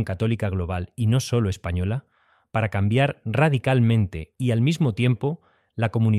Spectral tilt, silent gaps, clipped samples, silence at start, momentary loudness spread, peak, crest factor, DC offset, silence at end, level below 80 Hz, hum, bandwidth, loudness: -7 dB/octave; none; under 0.1%; 0 s; 9 LU; -6 dBFS; 16 dB; under 0.1%; 0 s; -46 dBFS; none; 12.5 kHz; -23 LUFS